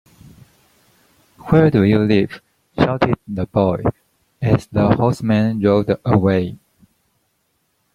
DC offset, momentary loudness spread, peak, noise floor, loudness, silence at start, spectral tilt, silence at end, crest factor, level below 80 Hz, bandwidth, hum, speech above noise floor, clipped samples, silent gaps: under 0.1%; 10 LU; -2 dBFS; -67 dBFS; -17 LUFS; 1.45 s; -8.5 dB/octave; 1.4 s; 18 dB; -44 dBFS; 11.5 kHz; none; 51 dB; under 0.1%; none